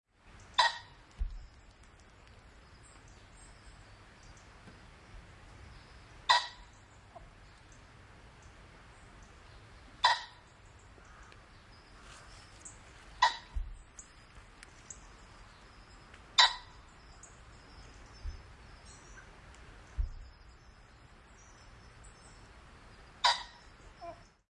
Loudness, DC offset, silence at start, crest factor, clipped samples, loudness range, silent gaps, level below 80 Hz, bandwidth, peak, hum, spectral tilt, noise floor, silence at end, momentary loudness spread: -31 LUFS; under 0.1%; 0.25 s; 32 dB; under 0.1%; 22 LU; none; -52 dBFS; 11.5 kHz; -8 dBFS; none; -1 dB/octave; -58 dBFS; 0.35 s; 27 LU